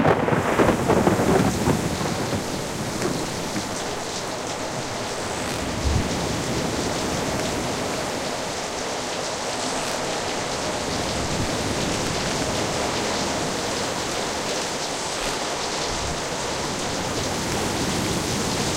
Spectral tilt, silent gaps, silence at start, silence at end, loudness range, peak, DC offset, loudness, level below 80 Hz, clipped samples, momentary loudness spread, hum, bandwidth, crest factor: -3.5 dB/octave; none; 0 s; 0 s; 3 LU; -4 dBFS; under 0.1%; -24 LUFS; -40 dBFS; under 0.1%; 7 LU; none; 16 kHz; 20 dB